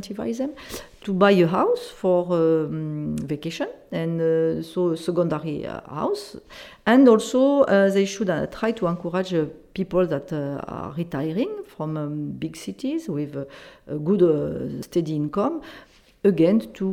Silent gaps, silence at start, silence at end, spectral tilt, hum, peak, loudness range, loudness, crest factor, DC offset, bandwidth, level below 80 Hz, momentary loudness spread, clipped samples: none; 0 s; 0 s; -7 dB/octave; none; -4 dBFS; 7 LU; -23 LUFS; 20 dB; under 0.1%; 16.5 kHz; -56 dBFS; 14 LU; under 0.1%